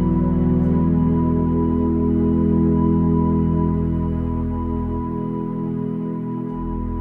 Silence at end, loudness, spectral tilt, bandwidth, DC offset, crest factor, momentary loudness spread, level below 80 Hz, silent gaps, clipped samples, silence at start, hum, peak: 0 s; -20 LUFS; -12.5 dB/octave; 3.1 kHz; under 0.1%; 12 dB; 8 LU; -30 dBFS; none; under 0.1%; 0 s; none; -8 dBFS